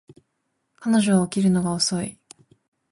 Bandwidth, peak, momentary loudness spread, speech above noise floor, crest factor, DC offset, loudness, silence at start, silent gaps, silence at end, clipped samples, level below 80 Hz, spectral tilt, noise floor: 11.5 kHz; -8 dBFS; 12 LU; 54 dB; 16 dB; under 0.1%; -21 LUFS; 0.8 s; none; 0.8 s; under 0.1%; -58 dBFS; -5 dB/octave; -75 dBFS